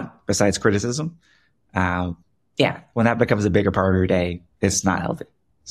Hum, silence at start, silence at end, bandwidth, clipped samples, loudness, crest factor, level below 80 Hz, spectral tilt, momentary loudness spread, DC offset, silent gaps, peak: none; 0 s; 0 s; 14.5 kHz; under 0.1%; -21 LUFS; 20 dB; -46 dBFS; -5 dB/octave; 12 LU; under 0.1%; none; -2 dBFS